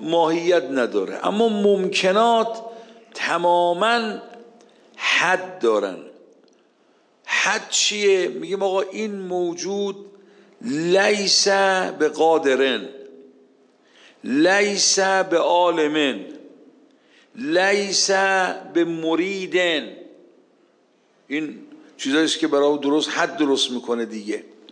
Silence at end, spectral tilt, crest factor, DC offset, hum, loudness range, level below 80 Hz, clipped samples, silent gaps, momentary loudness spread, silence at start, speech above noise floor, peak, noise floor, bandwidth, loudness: 0.3 s; -2.5 dB/octave; 16 dB; under 0.1%; none; 4 LU; -80 dBFS; under 0.1%; none; 12 LU; 0 s; 40 dB; -6 dBFS; -60 dBFS; 10.5 kHz; -20 LUFS